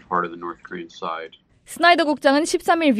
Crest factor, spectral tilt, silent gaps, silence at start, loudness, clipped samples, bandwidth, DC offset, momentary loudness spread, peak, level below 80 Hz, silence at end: 18 dB; -3.5 dB/octave; none; 0.1 s; -19 LUFS; under 0.1%; 15.5 kHz; under 0.1%; 19 LU; -2 dBFS; -62 dBFS; 0 s